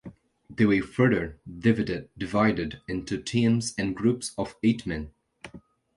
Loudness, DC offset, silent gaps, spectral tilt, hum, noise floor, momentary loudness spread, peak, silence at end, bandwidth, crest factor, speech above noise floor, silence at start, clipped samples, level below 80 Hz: -26 LUFS; under 0.1%; none; -6 dB/octave; none; -50 dBFS; 13 LU; -8 dBFS; 0.4 s; 11.5 kHz; 18 dB; 25 dB; 0.05 s; under 0.1%; -50 dBFS